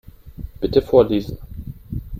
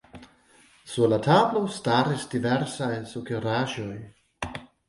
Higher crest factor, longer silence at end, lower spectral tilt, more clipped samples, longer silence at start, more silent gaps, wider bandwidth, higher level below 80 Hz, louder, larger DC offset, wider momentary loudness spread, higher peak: about the same, 20 dB vs 20 dB; second, 0 s vs 0.25 s; first, -8.5 dB/octave vs -6 dB/octave; neither; about the same, 0.25 s vs 0.15 s; neither; first, 15 kHz vs 11.5 kHz; first, -36 dBFS vs -58 dBFS; first, -18 LUFS vs -26 LUFS; neither; first, 21 LU vs 16 LU; first, 0 dBFS vs -8 dBFS